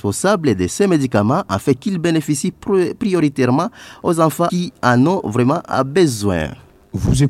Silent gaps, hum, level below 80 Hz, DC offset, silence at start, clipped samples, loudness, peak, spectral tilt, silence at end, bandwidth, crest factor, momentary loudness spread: none; none; -38 dBFS; under 0.1%; 0.05 s; under 0.1%; -17 LUFS; 0 dBFS; -6 dB/octave; 0 s; 15.5 kHz; 16 dB; 6 LU